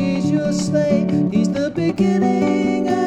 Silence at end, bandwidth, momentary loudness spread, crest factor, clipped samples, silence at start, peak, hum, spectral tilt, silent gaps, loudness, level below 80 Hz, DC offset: 0 s; 9.8 kHz; 2 LU; 14 dB; under 0.1%; 0 s; -4 dBFS; none; -7 dB/octave; none; -18 LUFS; -50 dBFS; under 0.1%